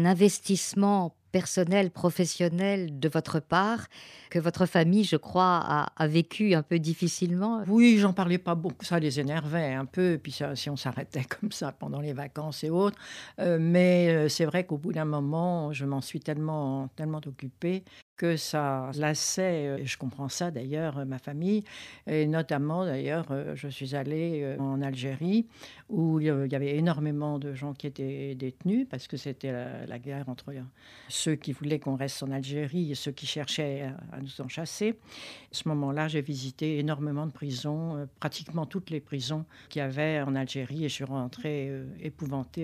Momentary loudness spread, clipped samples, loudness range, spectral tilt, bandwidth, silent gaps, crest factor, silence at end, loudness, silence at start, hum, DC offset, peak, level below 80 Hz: 12 LU; under 0.1%; 8 LU; -5.5 dB/octave; 15 kHz; 18.02-18.16 s; 20 dB; 0 s; -29 LUFS; 0 s; none; under 0.1%; -10 dBFS; -68 dBFS